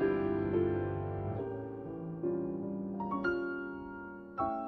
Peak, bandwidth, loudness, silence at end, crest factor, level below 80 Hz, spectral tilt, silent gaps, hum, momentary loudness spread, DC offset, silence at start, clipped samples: -20 dBFS; 4.6 kHz; -36 LUFS; 0 s; 16 dB; -58 dBFS; -10 dB/octave; none; none; 11 LU; under 0.1%; 0 s; under 0.1%